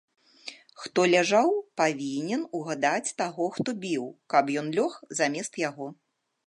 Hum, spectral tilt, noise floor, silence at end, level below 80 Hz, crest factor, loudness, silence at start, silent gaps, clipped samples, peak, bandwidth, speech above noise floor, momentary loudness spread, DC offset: none; -4 dB/octave; -47 dBFS; 0.55 s; -80 dBFS; 20 dB; -27 LUFS; 0.45 s; none; under 0.1%; -8 dBFS; 11.5 kHz; 20 dB; 18 LU; under 0.1%